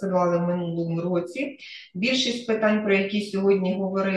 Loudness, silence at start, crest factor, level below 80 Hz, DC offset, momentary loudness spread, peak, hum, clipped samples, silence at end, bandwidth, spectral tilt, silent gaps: -24 LUFS; 0 s; 16 dB; -68 dBFS; under 0.1%; 9 LU; -8 dBFS; none; under 0.1%; 0 s; 10 kHz; -5.5 dB/octave; none